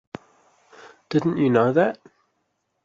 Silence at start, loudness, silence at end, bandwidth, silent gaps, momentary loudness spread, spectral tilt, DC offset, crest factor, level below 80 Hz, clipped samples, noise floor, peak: 0.8 s; -21 LUFS; 0.9 s; 7.6 kHz; none; 23 LU; -8 dB/octave; under 0.1%; 20 dB; -66 dBFS; under 0.1%; -74 dBFS; -6 dBFS